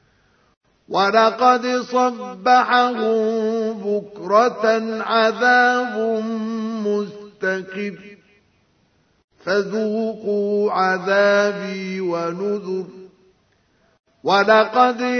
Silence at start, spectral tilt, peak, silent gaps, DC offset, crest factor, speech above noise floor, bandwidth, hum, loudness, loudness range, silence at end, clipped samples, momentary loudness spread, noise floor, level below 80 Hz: 0.9 s; -5 dB/octave; -2 dBFS; 9.24-9.28 s, 14.00-14.04 s; under 0.1%; 18 dB; 43 dB; 6.6 kHz; none; -19 LUFS; 8 LU; 0 s; under 0.1%; 11 LU; -62 dBFS; -70 dBFS